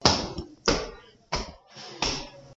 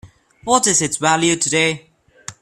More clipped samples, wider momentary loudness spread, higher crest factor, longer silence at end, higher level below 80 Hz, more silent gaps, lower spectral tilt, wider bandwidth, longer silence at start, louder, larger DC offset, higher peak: neither; second, 15 LU vs 19 LU; first, 28 dB vs 18 dB; about the same, 0 s vs 0.1 s; first, -44 dBFS vs -54 dBFS; neither; about the same, -3 dB/octave vs -2.5 dB/octave; second, 8 kHz vs 14.5 kHz; about the same, 0 s vs 0.05 s; second, -29 LUFS vs -16 LUFS; neither; about the same, -2 dBFS vs 0 dBFS